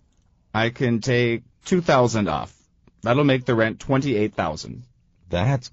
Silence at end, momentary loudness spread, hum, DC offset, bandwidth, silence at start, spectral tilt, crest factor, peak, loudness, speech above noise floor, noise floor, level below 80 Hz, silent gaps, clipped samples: 0.05 s; 11 LU; none; under 0.1%; 8 kHz; 0.55 s; -5.5 dB/octave; 18 dB; -4 dBFS; -22 LUFS; 40 dB; -61 dBFS; -48 dBFS; none; under 0.1%